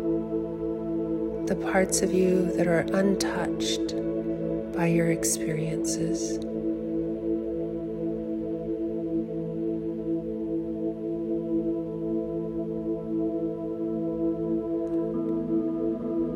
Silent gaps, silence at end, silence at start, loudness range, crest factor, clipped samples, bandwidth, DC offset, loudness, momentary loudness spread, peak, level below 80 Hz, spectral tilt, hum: none; 0 s; 0 s; 5 LU; 16 dB; under 0.1%; 16 kHz; under 0.1%; -28 LUFS; 7 LU; -10 dBFS; -50 dBFS; -5.5 dB/octave; none